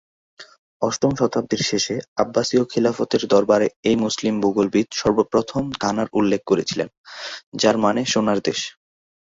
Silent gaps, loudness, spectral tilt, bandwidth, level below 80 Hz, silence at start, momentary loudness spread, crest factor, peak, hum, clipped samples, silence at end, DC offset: 0.59-0.80 s, 2.08-2.16 s, 3.76-3.83 s, 6.97-7.04 s, 7.46-7.52 s; -20 LUFS; -4.5 dB/octave; 8 kHz; -54 dBFS; 0.4 s; 8 LU; 18 dB; -2 dBFS; none; under 0.1%; 0.65 s; under 0.1%